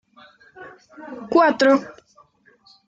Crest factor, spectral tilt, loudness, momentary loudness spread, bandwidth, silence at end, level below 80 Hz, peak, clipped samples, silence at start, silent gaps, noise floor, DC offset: 18 dB; -4.5 dB/octave; -18 LUFS; 26 LU; 7.8 kHz; 0.95 s; -68 dBFS; -4 dBFS; under 0.1%; 0.6 s; none; -56 dBFS; under 0.1%